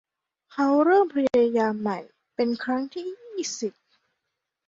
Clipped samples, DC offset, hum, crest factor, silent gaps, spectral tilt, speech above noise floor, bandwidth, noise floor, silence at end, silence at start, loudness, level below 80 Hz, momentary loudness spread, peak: under 0.1%; under 0.1%; none; 16 dB; none; -4.5 dB/octave; 59 dB; 7.8 kHz; -82 dBFS; 0.95 s; 0.55 s; -24 LUFS; -70 dBFS; 15 LU; -10 dBFS